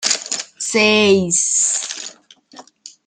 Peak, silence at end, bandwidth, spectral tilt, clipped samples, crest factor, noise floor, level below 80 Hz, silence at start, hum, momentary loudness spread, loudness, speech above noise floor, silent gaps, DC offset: -2 dBFS; 0.2 s; 10.5 kHz; -2 dB/octave; under 0.1%; 18 dB; -45 dBFS; -62 dBFS; 0 s; none; 14 LU; -15 LUFS; 30 dB; none; under 0.1%